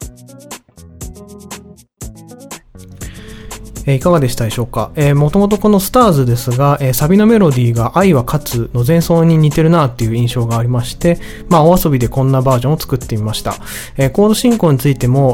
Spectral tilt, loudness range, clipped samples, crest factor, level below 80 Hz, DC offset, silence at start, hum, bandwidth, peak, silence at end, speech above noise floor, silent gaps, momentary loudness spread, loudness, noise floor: -6.5 dB/octave; 9 LU; under 0.1%; 12 dB; -32 dBFS; under 0.1%; 0 s; none; 18.5 kHz; 0 dBFS; 0 s; 23 dB; none; 22 LU; -12 LUFS; -34 dBFS